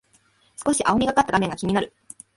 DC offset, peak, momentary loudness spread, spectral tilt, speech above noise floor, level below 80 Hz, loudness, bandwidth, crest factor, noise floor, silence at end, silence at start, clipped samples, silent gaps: under 0.1%; -4 dBFS; 11 LU; -4.5 dB/octave; 40 dB; -50 dBFS; -22 LUFS; 12 kHz; 18 dB; -61 dBFS; 0.5 s; 0.6 s; under 0.1%; none